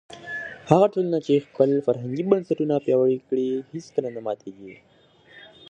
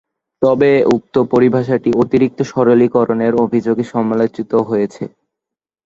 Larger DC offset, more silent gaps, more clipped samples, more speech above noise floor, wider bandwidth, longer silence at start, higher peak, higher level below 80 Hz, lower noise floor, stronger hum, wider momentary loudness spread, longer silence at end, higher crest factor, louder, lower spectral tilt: neither; neither; neither; second, 29 dB vs 70 dB; first, 8.6 kHz vs 7.6 kHz; second, 0.1 s vs 0.4 s; about the same, 0 dBFS vs 0 dBFS; second, -66 dBFS vs -52 dBFS; second, -52 dBFS vs -84 dBFS; neither; first, 13 LU vs 6 LU; second, 0.3 s vs 0.8 s; first, 24 dB vs 14 dB; second, -23 LUFS vs -14 LUFS; about the same, -7.5 dB/octave vs -8 dB/octave